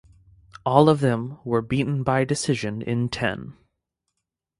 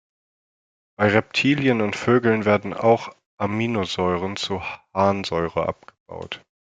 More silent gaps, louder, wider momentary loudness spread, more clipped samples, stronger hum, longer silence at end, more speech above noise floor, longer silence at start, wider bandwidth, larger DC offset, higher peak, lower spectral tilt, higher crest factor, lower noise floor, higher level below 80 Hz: second, none vs 3.26-3.38 s, 6.00-6.06 s; about the same, -23 LUFS vs -22 LUFS; second, 11 LU vs 15 LU; neither; neither; first, 1.1 s vs 0.25 s; second, 59 dB vs over 69 dB; second, 0.65 s vs 1 s; first, 11.5 kHz vs 9.2 kHz; neither; about the same, 0 dBFS vs -2 dBFS; about the same, -6 dB/octave vs -6 dB/octave; about the same, 24 dB vs 20 dB; second, -81 dBFS vs under -90 dBFS; first, -52 dBFS vs -58 dBFS